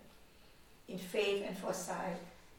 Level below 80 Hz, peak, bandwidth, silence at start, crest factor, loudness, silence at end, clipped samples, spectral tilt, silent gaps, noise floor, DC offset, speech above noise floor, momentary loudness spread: -68 dBFS; -22 dBFS; 18.5 kHz; 0 s; 20 dB; -39 LUFS; 0 s; under 0.1%; -4 dB/octave; none; -62 dBFS; under 0.1%; 23 dB; 13 LU